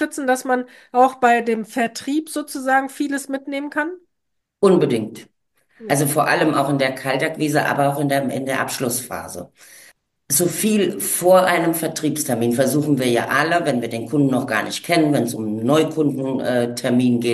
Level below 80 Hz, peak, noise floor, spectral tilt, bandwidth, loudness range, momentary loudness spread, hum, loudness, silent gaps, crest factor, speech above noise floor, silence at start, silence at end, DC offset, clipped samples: -64 dBFS; -2 dBFS; -76 dBFS; -4.5 dB/octave; 13 kHz; 4 LU; 8 LU; none; -19 LUFS; none; 18 dB; 57 dB; 0 s; 0 s; under 0.1%; under 0.1%